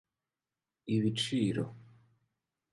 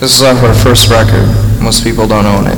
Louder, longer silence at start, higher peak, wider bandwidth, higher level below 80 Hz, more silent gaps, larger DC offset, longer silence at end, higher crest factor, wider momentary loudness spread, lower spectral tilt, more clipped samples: second, -33 LUFS vs -7 LUFS; first, 0.85 s vs 0 s; second, -18 dBFS vs 0 dBFS; second, 11.5 kHz vs 19.5 kHz; second, -70 dBFS vs -18 dBFS; neither; neither; first, 0.9 s vs 0 s; first, 18 dB vs 6 dB; first, 11 LU vs 5 LU; about the same, -5.5 dB/octave vs -4.5 dB/octave; neither